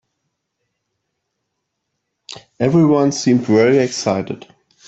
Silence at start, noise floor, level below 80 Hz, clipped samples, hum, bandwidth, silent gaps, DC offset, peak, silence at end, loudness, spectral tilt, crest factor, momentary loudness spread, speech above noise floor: 2.35 s; -75 dBFS; -56 dBFS; under 0.1%; none; 8.2 kHz; none; under 0.1%; -2 dBFS; 0.5 s; -15 LUFS; -6 dB/octave; 16 dB; 22 LU; 60 dB